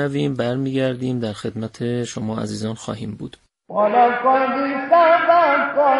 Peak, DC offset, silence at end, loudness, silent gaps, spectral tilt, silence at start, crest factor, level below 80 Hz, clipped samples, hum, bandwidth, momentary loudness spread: -2 dBFS; under 0.1%; 0 s; -19 LUFS; none; -6 dB/octave; 0 s; 16 dB; -58 dBFS; under 0.1%; none; 11.5 kHz; 15 LU